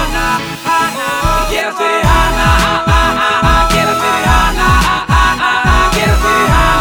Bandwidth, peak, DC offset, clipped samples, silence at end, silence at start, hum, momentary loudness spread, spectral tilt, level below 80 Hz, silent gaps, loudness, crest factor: over 20 kHz; 0 dBFS; under 0.1%; under 0.1%; 0 s; 0 s; none; 4 LU; -4 dB/octave; -18 dBFS; none; -11 LUFS; 10 dB